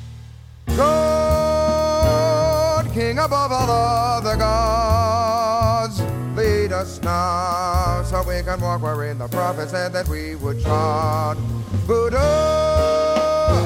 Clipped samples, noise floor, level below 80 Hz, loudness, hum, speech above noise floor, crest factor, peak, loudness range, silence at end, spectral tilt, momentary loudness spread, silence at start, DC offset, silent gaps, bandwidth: under 0.1%; -39 dBFS; -30 dBFS; -19 LUFS; none; 19 dB; 14 dB; -6 dBFS; 4 LU; 0 s; -6 dB/octave; 7 LU; 0 s; under 0.1%; none; 17 kHz